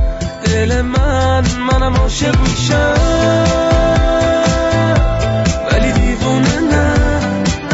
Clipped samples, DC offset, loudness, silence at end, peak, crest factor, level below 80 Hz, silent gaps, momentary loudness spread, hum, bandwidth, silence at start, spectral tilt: under 0.1%; under 0.1%; -13 LUFS; 0 s; -2 dBFS; 10 dB; -18 dBFS; none; 3 LU; none; 8 kHz; 0 s; -5.5 dB/octave